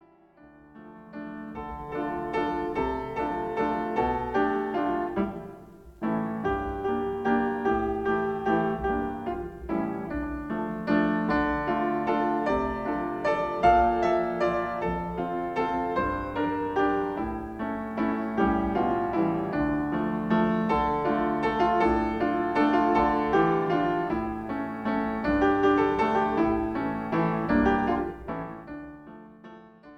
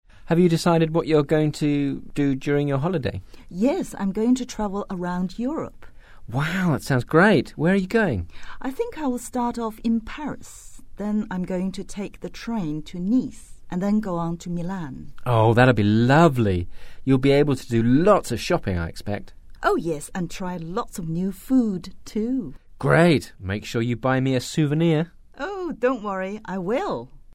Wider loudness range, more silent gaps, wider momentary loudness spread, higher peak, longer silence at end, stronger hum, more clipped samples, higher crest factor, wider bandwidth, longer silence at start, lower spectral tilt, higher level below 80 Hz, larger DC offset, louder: second, 4 LU vs 8 LU; neither; second, 10 LU vs 15 LU; second, -10 dBFS vs -2 dBFS; second, 0 s vs 0.15 s; neither; neither; about the same, 18 dB vs 20 dB; second, 8.2 kHz vs 16 kHz; first, 0.45 s vs 0.15 s; about the same, -8 dB/octave vs -7 dB/octave; about the same, -46 dBFS vs -44 dBFS; neither; second, -27 LUFS vs -23 LUFS